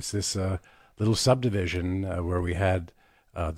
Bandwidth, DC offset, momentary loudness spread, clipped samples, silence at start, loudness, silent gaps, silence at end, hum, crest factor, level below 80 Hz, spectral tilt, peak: 15 kHz; under 0.1%; 11 LU; under 0.1%; 0 s; -27 LUFS; none; 0 s; none; 20 dB; -48 dBFS; -5 dB/octave; -8 dBFS